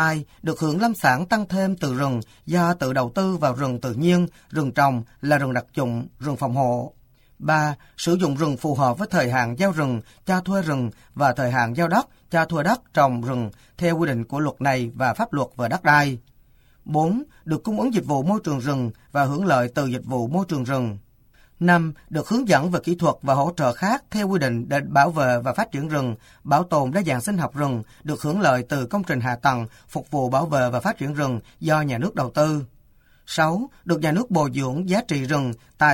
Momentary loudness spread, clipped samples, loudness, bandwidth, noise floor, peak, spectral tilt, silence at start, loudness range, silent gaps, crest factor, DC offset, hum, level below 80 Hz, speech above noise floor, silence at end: 8 LU; under 0.1%; -22 LUFS; 17 kHz; -55 dBFS; -2 dBFS; -6 dB/octave; 0 s; 2 LU; none; 20 dB; under 0.1%; none; -54 dBFS; 33 dB; 0 s